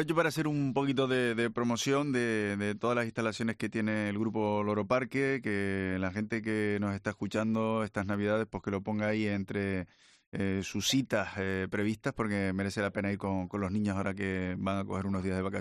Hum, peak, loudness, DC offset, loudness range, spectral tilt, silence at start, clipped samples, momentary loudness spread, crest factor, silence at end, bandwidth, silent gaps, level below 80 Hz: none; -14 dBFS; -32 LUFS; under 0.1%; 2 LU; -5.5 dB/octave; 0 s; under 0.1%; 5 LU; 18 dB; 0 s; 13.5 kHz; 10.27-10.32 s; -66 dBFS